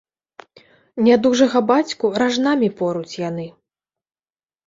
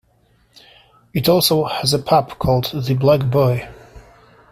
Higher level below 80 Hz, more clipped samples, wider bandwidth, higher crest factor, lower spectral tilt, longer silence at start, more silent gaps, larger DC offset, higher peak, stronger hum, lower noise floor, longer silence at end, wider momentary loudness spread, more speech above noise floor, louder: second, -62 dBFS vs -44 dBFS; neither; second, 7.8 kHz vs 16 kHz; about the same, 18 dB vs 16 dB; about the same, -5 dB/octave vs -5.5 dB/octave; second, 0.95 s vs 1.15 s; neither; neither; about the same, -2 dBFS vs -2 dBFS; neither; first, under -90 dBFS vs -58 dBFS; first, 1.15 s vs 0.5 s; first, 13 LU vs 7 LU; first, over 73 dB vs 41 dB; about the same, -18 LUFS vs -17 LUFS